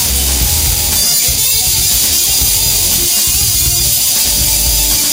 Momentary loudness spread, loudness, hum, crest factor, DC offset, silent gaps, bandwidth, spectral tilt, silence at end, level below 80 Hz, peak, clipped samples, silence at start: 2 LU; -9 LUFS; none; 12 dB; under 0.1%; none; 17 kHz; -0.5 dB/octave; 0 s; -22 dBFS; 0 dBFS; under 0.1%; 0 s